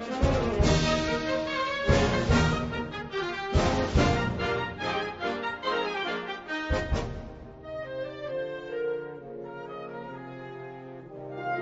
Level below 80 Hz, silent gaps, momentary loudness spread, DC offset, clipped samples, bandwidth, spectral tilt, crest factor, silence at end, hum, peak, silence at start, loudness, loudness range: -38 dBFS; none; 16 LU; under 0.1%; under 0.1%; 8 kHz; -5.5 dB/octave; 20 dB; 0 s; none; -8 dBFS; 0 s; -29 LUFS; 10 LU